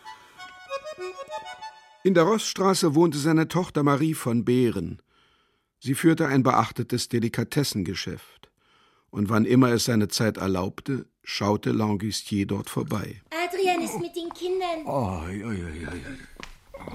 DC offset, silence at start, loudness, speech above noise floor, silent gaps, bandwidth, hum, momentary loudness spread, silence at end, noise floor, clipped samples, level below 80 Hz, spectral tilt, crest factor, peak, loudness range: under 0.1%; 0.05 s; -25 LUFS; 43 dB; none; 16 kHz; none; 17 LU; 0 s; -68 dBFS; under 0.1%; -54 dBFS; -5.5 dB/octave; 20 dB; -4 dBFS; 5 LU